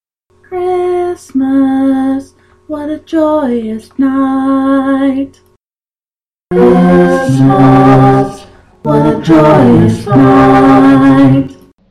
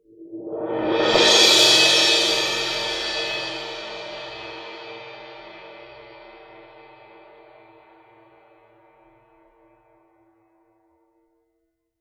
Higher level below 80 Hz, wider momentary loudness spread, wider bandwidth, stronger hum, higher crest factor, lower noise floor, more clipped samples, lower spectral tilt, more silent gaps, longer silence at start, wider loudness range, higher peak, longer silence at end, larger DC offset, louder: first, -36 dBFS vs -58 dBFS; second, 14 LU vs 28 LU; second, 10.5 kHz vs 18.5 kHz; neither; second, 8 dB vs 22 dB; first, under -90 dBFS vs -74 dBFS; neither; first, -8.5 dB/octave vs -0.5 dB/octave; neither; first, 0.5 s vs 0.2 s; second, 7 LU vs 24 LU; about the same, 0 dBFS vs -2 dBFS; second, 0.35 s vs 5.4 s; neither; first, -8 LUFS vs -17 LUFS